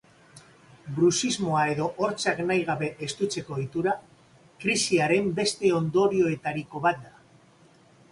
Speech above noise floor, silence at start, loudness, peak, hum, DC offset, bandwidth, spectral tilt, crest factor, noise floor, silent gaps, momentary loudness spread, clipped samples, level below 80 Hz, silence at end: 31 dB; 0.35 s; -26 LUFS; -10 dBFS; none; under 0.1%; 11.5 kHz; -4.5 dB/octave; 18 dB; -57 dBFS; none; 9 LU; under 0.1%; -64 dBFS; 1.05 s